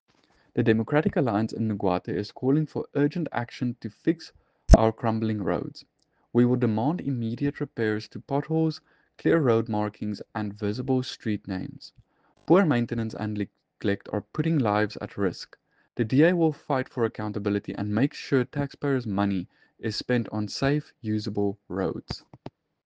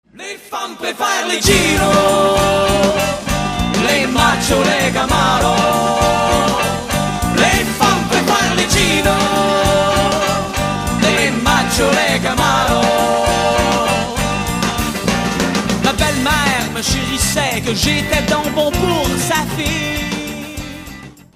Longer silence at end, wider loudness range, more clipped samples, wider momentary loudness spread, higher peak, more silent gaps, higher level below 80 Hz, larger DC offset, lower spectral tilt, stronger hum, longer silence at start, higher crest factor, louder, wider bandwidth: about the same, 0.35 s vs 0.25 s; about the same, 3 LU vs 2 LU; neither; first, 12 LU vs 6 LU; second, -4 dBFS vs 0 dBFS; neither; second, -38 dBFS vs -30 dBFS; neither; first, -7.5 dB/octave vs -3.5 dB/octave; neither; first, 0.55 s vs 0.15 s; first, 24 dB vs 16 dB; second, -27 LUFS vs -14 LUFS; second, 9.2 kHz vs 15.5 kHz